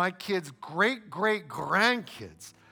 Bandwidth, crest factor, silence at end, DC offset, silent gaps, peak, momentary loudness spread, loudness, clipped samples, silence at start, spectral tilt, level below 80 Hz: over 20 kHz; 20 dB; 0.2 s; under 0.1%; none; -10 dBFS; 19 LU; -28 LUFS; under 0.1%; 0 s; -4 dB/octave; -70 dBFS